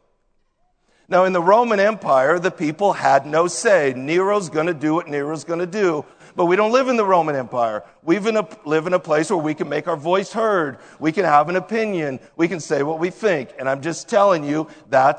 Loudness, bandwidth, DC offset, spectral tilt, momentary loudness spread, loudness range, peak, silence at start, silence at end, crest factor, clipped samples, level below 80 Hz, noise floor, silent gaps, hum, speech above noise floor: -19 LUFS; 9.4 kHz; under 0.1%; -5 dB/octave; 8 LU; 4 LU; 0 dBFS; 1.1 s; 0 s; 18 dB; under 0.1%; -66 dBFS; -64 dBFS; none; none; 46 dB